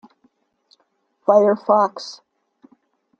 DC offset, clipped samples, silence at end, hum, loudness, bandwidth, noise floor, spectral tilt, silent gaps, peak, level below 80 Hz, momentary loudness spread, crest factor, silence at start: under 0.1%; under 0.1%; 1.1 s; none; -17 LUFS; 7.4 kHz; -67 dBFS; -6 dB/octave; none; -2 dBFS; -76 dBFS; 18 LU; 20 dB; 1.3 s